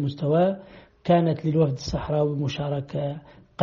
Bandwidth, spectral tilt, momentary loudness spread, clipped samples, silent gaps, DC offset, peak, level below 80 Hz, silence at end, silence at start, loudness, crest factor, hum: 7.2 kHz; -7 dB/octave; 13 LU; under 0.1%; none; under 0.1%; -4 dBFS; -48 dBFS; 0 s; 0 s; -25 LUFS; 20 dB; none